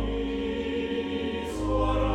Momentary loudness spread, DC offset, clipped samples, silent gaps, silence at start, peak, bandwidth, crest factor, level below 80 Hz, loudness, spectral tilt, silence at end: 5 LU; under 0.1%; under 0.1%; none; 0 s; -14 dBFS; 12 kHz; 14 dB; -34 dBFS; -29 LUFS; -6.5 dB/octave; 0 s